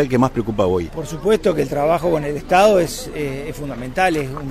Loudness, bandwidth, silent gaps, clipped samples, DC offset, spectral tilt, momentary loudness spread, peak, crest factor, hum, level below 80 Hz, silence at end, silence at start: -19 LUFS; 16 kHz; none; under 0.1%; under 0.1%; -5.5 dB/octave; 11 LU; -2 dBFS; 16 dB; none; -36 dBFS; 0 s; 0 s